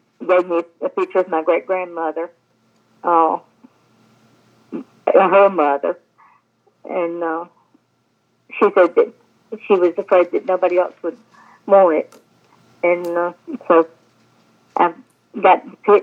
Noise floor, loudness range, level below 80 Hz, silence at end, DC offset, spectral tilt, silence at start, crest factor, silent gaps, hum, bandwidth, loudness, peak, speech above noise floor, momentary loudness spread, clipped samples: -64 dBFS; 4 LU; -84 dBFS; 0 s; under 0.1%; -7 dB/octave; 0.2 s; 18 dB; none; none; 6.6 kHz; -17 LUFS; 0 dBFS; 48 dB; 19 LU; under 0.1%